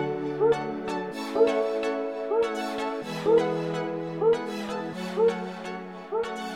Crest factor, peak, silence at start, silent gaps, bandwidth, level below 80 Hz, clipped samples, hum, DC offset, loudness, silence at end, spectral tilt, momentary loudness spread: 18 dB; -10 dBFS; 0 s; none; 13 kHz; -66 dBFS; under 0.1%; none; under 0.1%; -27 LUFS; 0 s; -6 dB/octave; 9 LU